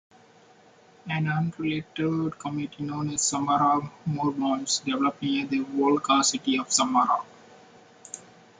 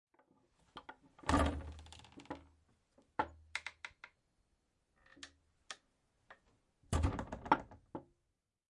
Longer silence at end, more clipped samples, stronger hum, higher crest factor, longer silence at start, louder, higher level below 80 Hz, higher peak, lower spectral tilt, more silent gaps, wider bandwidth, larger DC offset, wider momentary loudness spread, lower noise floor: second, 0.4 s vs 0.7 s; neither; neither; second, 20 dB vs 30 dB; first, 1.05 s vs 0.75 s; first, -26 LUFS vs -39 LUFS; second, -66 dBFS vs -52 dBFS; first, -8 dBFS vs -14 dBFS; second, -4 dB/octave vs -5.5 dB/octave; neither; second, 9.6 kHz vs 11.5 kHz; neither; second, 11 LU vs 21 LU; second, -56 dBFS vs -86 dBFS